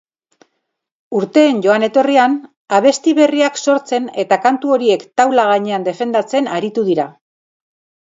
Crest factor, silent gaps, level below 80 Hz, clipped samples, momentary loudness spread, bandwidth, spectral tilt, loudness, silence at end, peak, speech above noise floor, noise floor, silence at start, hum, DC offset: 14 dB; 2.57-2.65 s; -68 dBFS; under 0.1%; 7 LU; 7.8 kHz; -4.5 dB/octave; -14 LUFS; 1 s; 0 dBFS; 59 dB; -73 dBFS; 1.1 s; none; under 0.1%